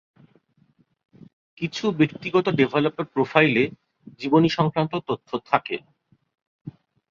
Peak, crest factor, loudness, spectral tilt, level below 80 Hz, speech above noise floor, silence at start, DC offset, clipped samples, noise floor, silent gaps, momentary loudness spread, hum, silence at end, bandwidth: 0 dBFS; 24 dB; -23 LUFS; -7 dB/octave; -64 dBFS; 41 dB; 1.6 s; under 0.1%; under 0.1%; -63 dBFS; 6.42-6.65 s; 15 LU; none; 0.4 s; 7.4 kHz